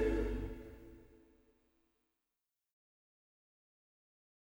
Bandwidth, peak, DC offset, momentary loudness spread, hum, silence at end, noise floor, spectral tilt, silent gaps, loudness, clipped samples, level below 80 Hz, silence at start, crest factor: over 20 kHz; -24 dBFS; under 0.1%; 22 LU; none; 3.35 s; under -90 dBFS; -7.5 dB/octave; none; -41 LUFS; under 0.1%; -50 dBFS; 0 s; 20 dB